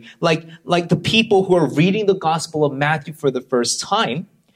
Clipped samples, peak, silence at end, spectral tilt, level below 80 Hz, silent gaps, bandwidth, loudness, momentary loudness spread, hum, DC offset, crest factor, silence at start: under 0.1%; 0 dBFS; 0.3 s; -4.5 dB/octave; -56 dBFS; none; 15 kHz; -18 LUFS; 7 LU; none; under 0.1%; 18 dB; 0.05 s